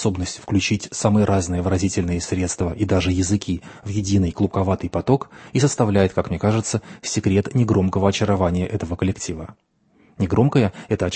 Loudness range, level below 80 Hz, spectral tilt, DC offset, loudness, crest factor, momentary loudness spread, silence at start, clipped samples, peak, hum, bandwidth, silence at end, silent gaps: 2 LU; -42 dBFS; -6 dB/octave; under 0.1%; -21 LUFS; 18 dB; 8 LU; 0 s; under 0.1%; -2 dBFS; none; 8.8 kHz; 0 s; none